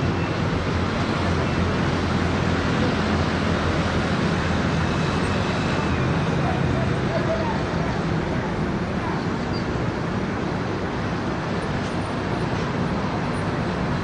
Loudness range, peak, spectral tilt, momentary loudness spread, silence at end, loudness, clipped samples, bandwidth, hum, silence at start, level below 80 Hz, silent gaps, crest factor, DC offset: 3 LU; -10 dBFS; -6.5 dB/octave; 4 LU; 0 s; -23 LUFS; under 0.1%; 10.5 kHz; none; 0 s; -38 dBFS; none; 14 dB; under 0.1%